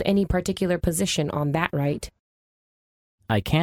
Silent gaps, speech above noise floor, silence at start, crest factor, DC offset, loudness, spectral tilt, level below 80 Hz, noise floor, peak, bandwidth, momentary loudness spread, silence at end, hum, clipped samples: 2.19-3.18 s; over 67 dB; 0 s; 20 dB; under 0.1%; -25 LUFS; -5.5 dB/octave; -40 dBFS; under -90 dBFS; -6 dBFS; 18 kHz; 5 LU; 0 s; none; under 0.1%